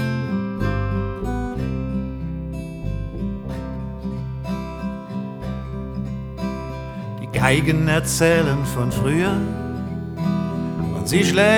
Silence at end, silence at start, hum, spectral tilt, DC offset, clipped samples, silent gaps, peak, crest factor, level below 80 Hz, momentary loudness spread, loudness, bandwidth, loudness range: 0 s; 0 s; none; -5.5 dB/octave; under 0.1%; under 0.1%; none; 0 dBFS; 22 dB; -34 dBFS; 12 LU; -23 LUFS; 18 kHz; 9 LU